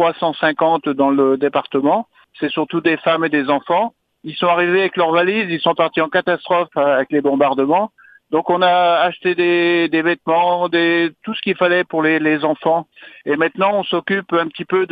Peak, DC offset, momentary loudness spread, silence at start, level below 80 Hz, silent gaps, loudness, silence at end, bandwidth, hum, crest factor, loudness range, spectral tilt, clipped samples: 0 dBFS; under 0.1%; 6 LU; 0 s; -66 dBFS; none; -17 LUFS; 0.05 s; 4.9 kHz; none; 16 dB; 2 LU; -8 dB/octave; under 0.1%